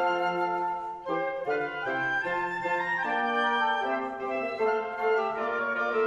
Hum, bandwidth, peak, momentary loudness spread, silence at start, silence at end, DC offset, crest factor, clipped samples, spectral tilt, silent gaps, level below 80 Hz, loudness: none; 9.8 kHz; -14 dBFS; 5 LU; 0 s; 0 s; under 0.1%; 14 dB; under 0.1%; -5 dB/octave; none; -66 dBFS; -29 LUFS